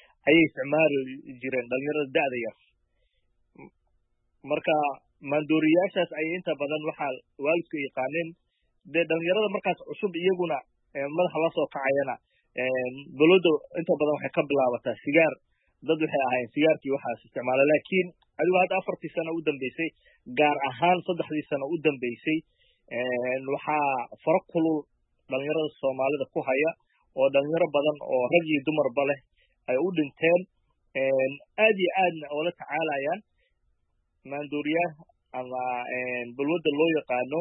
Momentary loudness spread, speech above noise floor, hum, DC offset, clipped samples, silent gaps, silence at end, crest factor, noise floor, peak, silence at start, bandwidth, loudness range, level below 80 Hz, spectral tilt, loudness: 11 LU; 47 dB; none; under 0.1%; under 0.1%; none; 0 s; 18 dB; -73 dBFS; -8 dBFS; 0.25 s; 4 kHz; 5 LU; -74 dBFS; -10 dB/octave; -27 LUFS